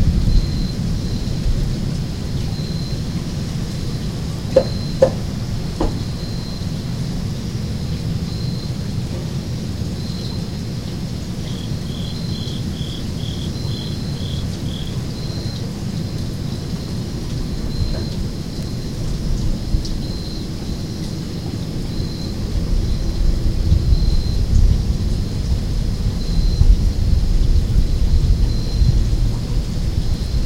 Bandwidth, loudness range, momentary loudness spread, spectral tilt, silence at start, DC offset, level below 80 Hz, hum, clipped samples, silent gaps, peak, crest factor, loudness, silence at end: 15.5 kHz; 6 LU; 8 LU; -6.5 dB/octave; 0 s; 1%; -22 dBFS; none; under 0.1%; none; 0 dBFS; 18 dB; -22 LUFS; 0 s